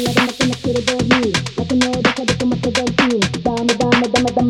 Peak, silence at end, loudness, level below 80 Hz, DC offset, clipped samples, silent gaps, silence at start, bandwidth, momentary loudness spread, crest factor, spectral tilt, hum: 0 dBFS; 0 s; -16 LUFS; -40 dBFS; under 0.1%; under 0.1%; none; 0 s; 15.5 kHz; 4 LU; 16 dB; -4.5 dB/octave; none